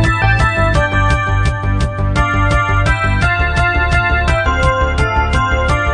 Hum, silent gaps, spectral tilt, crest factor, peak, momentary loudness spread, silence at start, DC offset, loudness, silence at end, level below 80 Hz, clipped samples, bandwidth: none; none; -6 dB/octave; 12 dB; 0 dBFS; 3 LU; 0 s; 0.2%; -14 LUFS; 0 s; -18 dBFS; under 0.1%; 10 kHz